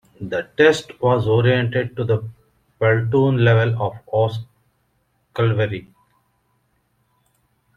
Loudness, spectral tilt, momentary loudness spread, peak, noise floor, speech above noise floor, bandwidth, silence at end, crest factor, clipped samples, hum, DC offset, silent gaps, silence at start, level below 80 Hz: -19 LUFS; -7 dB/octave; 11 LU; -2 dBFS; -66 dBFS; 48 dB; 9 kHz; 1.95 s; 18 dB; under 0.1%; none; under 0.1%; none; 0.2 s; -56 dBFS